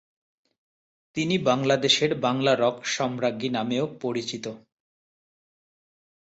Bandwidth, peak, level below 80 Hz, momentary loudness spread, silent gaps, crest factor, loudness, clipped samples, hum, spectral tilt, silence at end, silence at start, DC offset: 8.2 kHz; -8 dBFS; -66 dBFS; 10 LU; none; 20 dB; -24 LUFS; under 0.1%; none; -4 dB/octave; 1.7 s; 1.15 s; under 0.1%